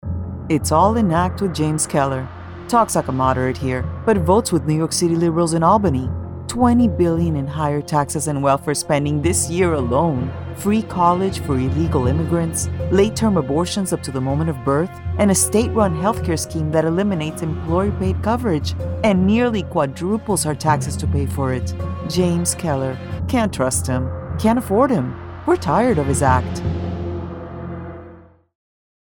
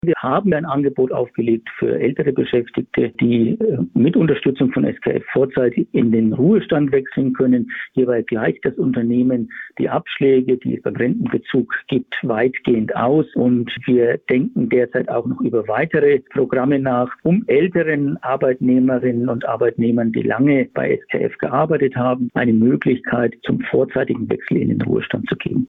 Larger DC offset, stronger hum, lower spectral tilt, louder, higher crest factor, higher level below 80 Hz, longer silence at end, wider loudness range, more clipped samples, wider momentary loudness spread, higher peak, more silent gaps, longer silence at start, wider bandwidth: neither; neither; second, -5.5 dB/octave vs -10.5 dB/octave; about the same, -19 LUFS vs -18 LUFS; first, 18 dB vs 12 dB; first, -36 dBFS vs -54 dBFS; first, 0.85 s vs 0 s; about the same, 3 LU vs 2 LU; neither; first, 10 LU vs 5 LU; first, -2 dBFS vs -6 dBFS; neither; about the same, 0.05 s vs 0.05 s; first, 19 kHz vs 3.9 kHz